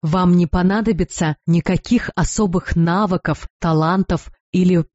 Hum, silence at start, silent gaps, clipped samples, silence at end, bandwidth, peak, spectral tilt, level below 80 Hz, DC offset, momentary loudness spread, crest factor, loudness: none; 0.05 s; 3.50-3.60 s, 4.40-4.53 s; under 0.1%; 0.1 s; 8 kHz; -6 dBFS; -7 dB/octave; -34 dBFS; under 0.1%; 7 LU; 12 dB; -18 LUFS